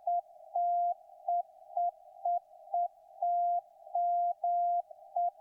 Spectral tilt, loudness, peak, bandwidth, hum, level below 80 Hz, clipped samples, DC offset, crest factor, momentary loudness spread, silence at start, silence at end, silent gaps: -4 dB/octave; -34 LUFS; -22 dBFS; 1 kHz; none; under -90 dBFS; under 0.1%; under 0.1%; 10 dB; 8 LU; 0.05 s; 0.1 s; none